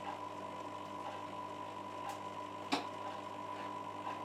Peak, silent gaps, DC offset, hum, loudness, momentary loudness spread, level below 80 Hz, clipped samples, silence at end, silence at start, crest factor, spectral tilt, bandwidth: -22 dBFS; none; under 0.1%; none; -44 LUFS; 6 LU; -84 dBFS; under 0.1%; 0 s; 0 s; 22 dB; -4 dB/octave; 15.5 kHz